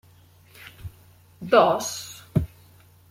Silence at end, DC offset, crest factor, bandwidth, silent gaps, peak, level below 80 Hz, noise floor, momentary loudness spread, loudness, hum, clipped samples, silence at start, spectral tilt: 0.65 s; under 0.1%; 22 dB; 16.5 kHz; none; -4 dBFS; -48 dBFS; -54 dBFS; 25 LU; -23 LUFS; none; under 0.1%; 0.6 s; -5 dB/octave